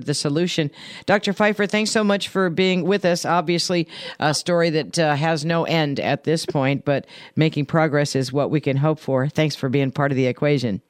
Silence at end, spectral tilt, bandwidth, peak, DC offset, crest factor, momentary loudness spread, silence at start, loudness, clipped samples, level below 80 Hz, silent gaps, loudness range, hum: 0.1 s; -5.5 dB/octave; 14.5 kHz; -6 dBFS; under 0.1%; 16 dB; 4 LU; 0 s; -21 LUFS; under 0.1%; -62 dBFS; none; 1 LU; none